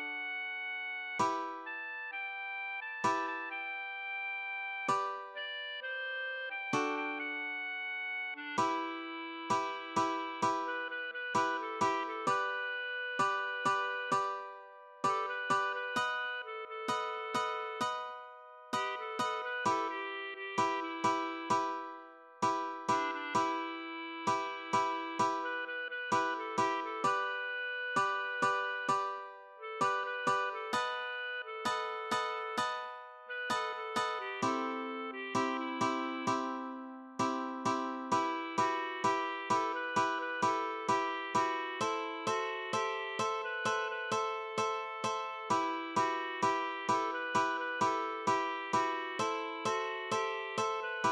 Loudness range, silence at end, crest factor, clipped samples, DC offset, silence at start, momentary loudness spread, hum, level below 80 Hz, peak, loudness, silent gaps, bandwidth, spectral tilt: 3 LU; 0 s; 16 dB; under 0.1%; under 0.1%; 0 s; 6 LU; none; -82 dBFS; -18 dBFS; -35 LUFS; none; 13 kHz; -3 dB/octave